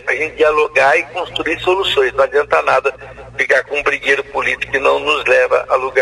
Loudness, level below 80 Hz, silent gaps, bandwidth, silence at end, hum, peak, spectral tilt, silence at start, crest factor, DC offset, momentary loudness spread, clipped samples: -14 LUFS; -46 dBFS; none; 12 kHz; 0 s; none; 0 dBFS; -3 dB/octave; 0.05 s; 14 dB; under 0.1%; 7 LU; under 0.1%